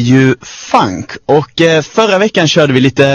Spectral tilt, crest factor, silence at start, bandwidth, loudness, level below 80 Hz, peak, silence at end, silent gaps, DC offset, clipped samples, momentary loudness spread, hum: -5.5 dB/octave; 10 dB; 0 s; 9.6 kHz; -10 LUFS; -46 dBFS; 0 dBFS; 0 s; none; under 0.1%; 0.8%; 6 LU; none